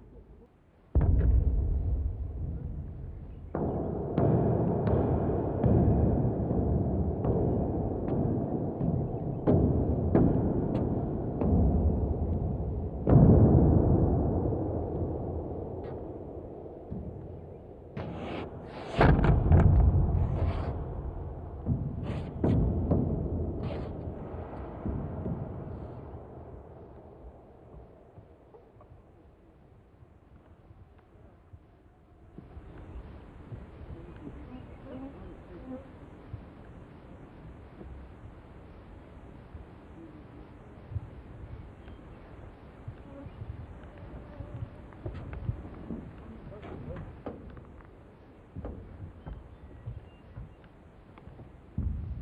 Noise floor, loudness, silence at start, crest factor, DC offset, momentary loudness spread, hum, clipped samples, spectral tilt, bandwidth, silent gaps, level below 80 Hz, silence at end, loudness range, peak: -60 dBFS; -29 LUFS; 0 s; 24 dB; under 0.1%; 24 LU; none; under 0.1%; -11 dB/octave; 4.9 kHz; none; -36 dBFS; 0 s; 22 LU; -6 dBFS